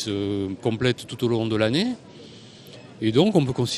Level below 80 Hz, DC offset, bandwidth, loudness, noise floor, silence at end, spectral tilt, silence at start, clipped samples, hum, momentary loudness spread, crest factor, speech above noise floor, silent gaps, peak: -56 dBFS; under 0.1%; 13 kHz; -23 LUFS; -44 dBFS; 0 s; -6 dB/octave; 0 s; under 0.1%; none; 24 LU; 20 dB; 22 dB; none; -4 dBFS